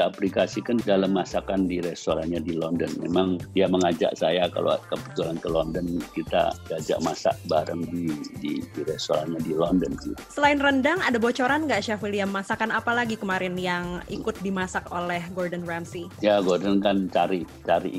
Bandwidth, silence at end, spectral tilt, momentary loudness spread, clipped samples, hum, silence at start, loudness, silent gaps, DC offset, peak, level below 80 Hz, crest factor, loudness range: 16 kHz; 0 s; -5.5 dB/octave; 9 LU; under 0.1%; none; 0 s; -25 LUFS; none; under 0.1%; -4 dBFS; -50 dBFS; 20 dB; 4 LU